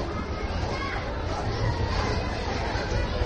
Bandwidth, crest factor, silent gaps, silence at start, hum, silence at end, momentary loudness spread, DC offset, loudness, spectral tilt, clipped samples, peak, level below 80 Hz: 9.2 kHz; 14 dB; none; 0 s; none; 0 s; 4 LU; under 0.1%; -29 LUFS; -6 dB/octave; under 0.1%; -14 dBFS; -34 dBFS